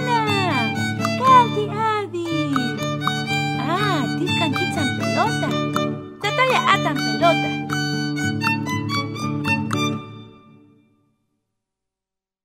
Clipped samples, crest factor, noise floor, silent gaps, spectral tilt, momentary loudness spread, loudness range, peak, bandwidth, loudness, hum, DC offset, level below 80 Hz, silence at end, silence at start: under 0.1%; 20 dB; -87 dBFS; none; -5 dB/octave; 7 LU; 6 LU; -2 dBFS; 16 kHz; -20 LUFS; none; under 0.1%; -60 dBFS; 2.15 s; 0 s